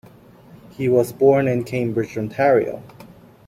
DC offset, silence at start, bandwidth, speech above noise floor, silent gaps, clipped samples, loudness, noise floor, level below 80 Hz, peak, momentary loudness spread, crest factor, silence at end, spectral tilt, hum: under 0.1%; 0.8 s; 15.5 kHz; 28 dB; none; under 0.1%; -19 LUFS; -46 dBFS; -56 dBFS; -4 dBFS; 10 LU; 16 dB; 0.4 s; -7.5 dB/octave; none